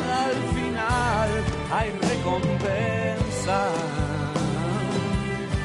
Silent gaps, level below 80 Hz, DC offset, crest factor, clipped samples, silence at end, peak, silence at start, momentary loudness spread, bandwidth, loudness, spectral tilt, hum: none; -38 dBFS; under 0.1%; 14 dB; under 0.1%; 0 s; -10 dBFS; 0 s; 3 LU; 11 kHz; -25 LUFS; -5.5 dB/octave; none